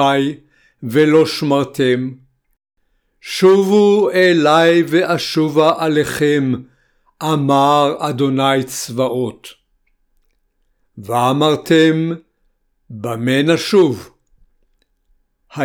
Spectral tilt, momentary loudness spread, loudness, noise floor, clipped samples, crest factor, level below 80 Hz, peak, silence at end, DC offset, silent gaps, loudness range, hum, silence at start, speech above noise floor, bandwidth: -5.5 dB/octave; 14 LU; -15 LUFS; -63 dBFS; under 0.1%; 16 dB; -58 dBFS; 0 dBFS; 0 s; under 0.1%; none; 6 LU; none; 0 s; 49 dB; 19.5 kHz